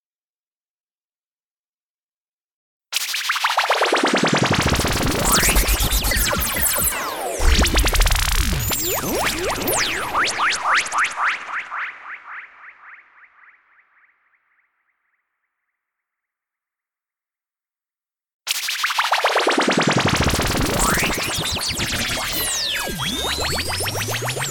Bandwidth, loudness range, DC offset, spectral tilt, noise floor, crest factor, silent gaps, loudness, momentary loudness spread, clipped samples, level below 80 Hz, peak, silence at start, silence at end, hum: 19 kHz; 10 LU; under 0.1%; -2.5 dB/octave; under -90 dBFS; 18 dB; 18.33-18.40 s; -19 LUFS; 7 LU; under 0.1%; -30 dBFS; -4 dBFS; 2.9 s; 0 s; none